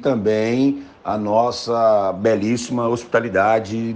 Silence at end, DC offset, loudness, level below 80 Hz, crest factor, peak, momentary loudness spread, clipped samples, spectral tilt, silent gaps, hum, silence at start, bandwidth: 0 s; under 0.1%; -19 LUFS; -58 dBFS; 14 dB; -4 dBFS; 5 LU; under 0.1%; -6 dB/octave; none; none; 0 s; 9.8 kHz